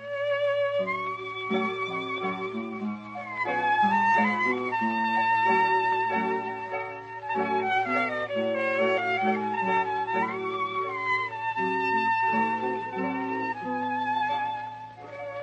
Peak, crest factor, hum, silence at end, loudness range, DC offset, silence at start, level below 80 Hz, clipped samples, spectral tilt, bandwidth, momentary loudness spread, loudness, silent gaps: -12 dBFS; 16 dB; none; 0 s; 4 LU; under 0.1%; 0 s; -72 dBFS; under 0.1%; -6 dB/octave; 8.6 kHz; 10 LU; -27 LUFS; none